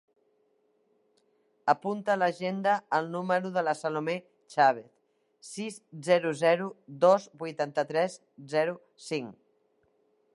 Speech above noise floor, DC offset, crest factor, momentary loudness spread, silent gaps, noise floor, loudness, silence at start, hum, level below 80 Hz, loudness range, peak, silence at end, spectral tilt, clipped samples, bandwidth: 42 dB; under 0.1%; 22 dB; 14 LU; none; -71 dBFS; -29 LUFS; 1.65 s; none; -84 dBFS; 3 LU; -8 dBFS; 1.05 s; -5 dB/octave; under 0.1%; 11.5 kHz